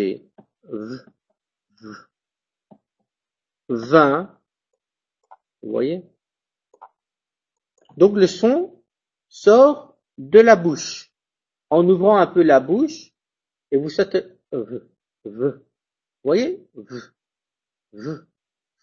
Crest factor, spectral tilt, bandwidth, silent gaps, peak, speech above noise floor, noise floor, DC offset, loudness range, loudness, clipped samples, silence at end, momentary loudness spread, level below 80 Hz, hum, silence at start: 20 dB; -6 dB/octave; 7.6 kHz; none; 0 dBFS; 73 dB; -90 dBFS; under 0.1%; 16 LU; -17 LUFS; under 0.1%; 0.65 s; 23 LU; -64 dBFS; none; 0 s